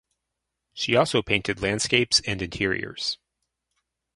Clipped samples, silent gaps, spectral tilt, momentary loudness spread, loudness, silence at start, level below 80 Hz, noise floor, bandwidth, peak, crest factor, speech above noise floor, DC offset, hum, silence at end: under 0.1%; none; -3 dB/octave; 10 LU; -24 LUFS; 0.75 s; -50 dBFS; -83 dBFS; 11.5 kHz; -2 dBFS; 24 dB; 58 dB; under 0.1%; none; 1 s